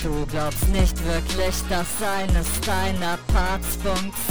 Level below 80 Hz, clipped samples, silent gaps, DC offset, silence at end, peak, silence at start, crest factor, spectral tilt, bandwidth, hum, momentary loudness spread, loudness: -26 dBFS; under 0.1%; none; 3%; 0 s; -8 dBFS; 0 s; 14 dB; -4.5 dB/octave; over 20 kHz; none; 3 LU; -24 LUFS